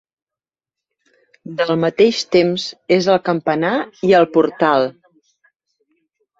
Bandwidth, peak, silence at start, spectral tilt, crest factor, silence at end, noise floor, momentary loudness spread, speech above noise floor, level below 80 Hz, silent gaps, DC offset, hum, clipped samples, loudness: 8 kHz; -2 dBFS; 1.45 s; -5.5 dB/octave; 16 dB; 1.5 s; -90 dBFS; 7 LU; 74 dB; -60 dBFS; none; under 0.1%; none; under 0.1%; -16 LUFS